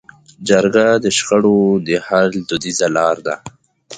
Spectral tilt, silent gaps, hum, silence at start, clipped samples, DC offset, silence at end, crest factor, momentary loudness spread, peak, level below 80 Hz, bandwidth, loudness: -4 dB/octave; none; none; 0.4 s; under 0.1%; under 0.1%; 0 s; 16 dB; 9 LU; 0 dBFS; -54 dBFS; 9.6 kHz; -15 LUFS